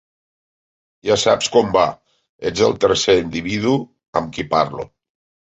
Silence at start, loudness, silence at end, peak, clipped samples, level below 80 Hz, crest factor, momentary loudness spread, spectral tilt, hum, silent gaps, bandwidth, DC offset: 1.05 s; -18 LUFS; 0.6 s; -2 dBFS; under 0.1%; -48 dBFS; 18 dB; 10 LU; -4 dB/octave; none; 2.29-2.39 s, 4.08-4.13 s; 8.2 kHz; under 0.1%